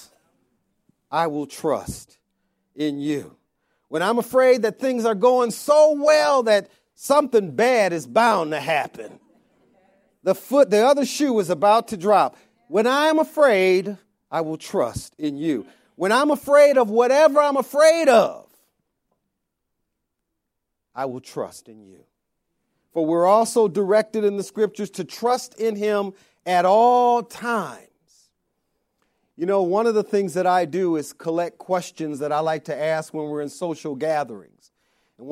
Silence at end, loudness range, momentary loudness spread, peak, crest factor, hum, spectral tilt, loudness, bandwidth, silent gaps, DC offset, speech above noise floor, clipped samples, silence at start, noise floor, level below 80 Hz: 0 s; 9 LU; 14 LU; -4 dBFS; 18 dB; none; -4.5 dB/octave; -20 LUFS; 16.5 kHz; none; under 0.1%; 59 dB; under 0.1%; 1.1 s; -79 dBFS; -62 dBFS